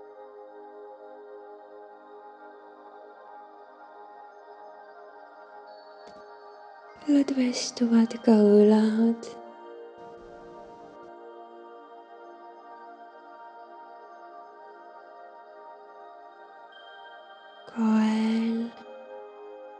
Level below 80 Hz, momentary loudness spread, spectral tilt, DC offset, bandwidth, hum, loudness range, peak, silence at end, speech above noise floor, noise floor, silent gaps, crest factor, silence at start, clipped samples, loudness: -76 dBFS; 25 LU; -6 dB/octave; under 0.1%; 9.2 kHz; none; 25 LU; -8 dBFS; 0.05 s; 28 dB; -49 dBFS; none; 22 dB; 0.2 s; under 0.1%; -23 LUFS